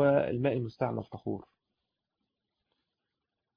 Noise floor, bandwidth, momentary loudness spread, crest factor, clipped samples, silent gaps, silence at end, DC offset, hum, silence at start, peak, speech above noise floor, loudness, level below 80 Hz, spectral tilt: -87 dBFS; 5.2 kHz; 12 LU; 20 dB; under 0.1%; none; 2.15 s; under 0.1%; none; 0 s; -14 dBFS; 54 dB; -32 LUFS; -66 dBFS; -7.5 dB/octave